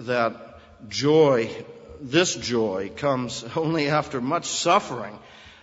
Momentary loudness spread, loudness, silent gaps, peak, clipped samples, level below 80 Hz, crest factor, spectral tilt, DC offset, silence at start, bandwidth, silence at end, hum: 19 LU; -23 LUFS; none; -4 dBFS; under 0.1%; -58 dBFS; 20 dB; -4 dB/octave; under 0.1%; 0 s; 8 kHz; 0.1 s; none